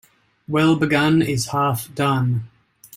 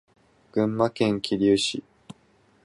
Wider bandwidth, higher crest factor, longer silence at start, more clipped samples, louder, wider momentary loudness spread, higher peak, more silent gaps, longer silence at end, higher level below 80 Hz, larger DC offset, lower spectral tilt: first, 16 kHz vs 11.5 kHz; about the same, 16 dB vs 18 dB; about the same, 0.5 s vs 0.55 s; neither; first, -19 LUFS vs -24 LUFS; about the same, 7 LU vs 8 LU; first, -4 dBFS vs -8 dBFS; neither; second, 0.5 s vs 0.85 s; first, -54 dBFS vs -60 dBFS; neither; about the same, -5.5 dB/octave vs -5 dB/octave